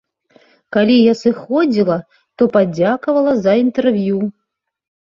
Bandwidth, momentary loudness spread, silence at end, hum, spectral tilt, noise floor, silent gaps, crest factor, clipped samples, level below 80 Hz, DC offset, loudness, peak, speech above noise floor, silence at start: 7.4 kHz; 8 LU; 0.75 s; none; -7.5 dB/octave; -52 dBFS; none; 14 dB; under 0.1%; -58 dBFS; under 0.1%; -15 LUFS; -2 dBFS; 38 dB; 0.7 s